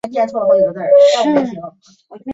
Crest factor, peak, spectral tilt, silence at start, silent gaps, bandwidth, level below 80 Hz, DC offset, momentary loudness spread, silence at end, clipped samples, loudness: 12 dB; -2 dBFS; -5 dB/octave; 0.05 s; none; 8 kHz; -60 dBFS; under 0.1%; 17 LU; 0 s; under 0.1%; -13 LUFS